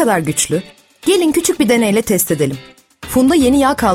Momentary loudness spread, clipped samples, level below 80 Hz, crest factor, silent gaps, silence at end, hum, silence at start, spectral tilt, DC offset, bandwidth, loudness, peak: 10 LU; under 0.1%; -40 dBFS; 14 dB; none; 0 s; none; 0 s; -4 dB/octave; under 0.1%; 16.5 kHz; -14 LUFS; 0 dBFS